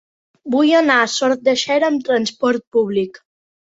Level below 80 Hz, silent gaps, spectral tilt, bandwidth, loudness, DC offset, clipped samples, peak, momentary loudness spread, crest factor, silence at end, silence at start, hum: -64 dBFS; 2.67-2.71 s; -3.5 dB/octave; 8 kHz; -16 LUFS; under 0.1%; under 0.1%; -2 dBFS; 8 LU; 16 dB; 0.5 s; 0.45 s; none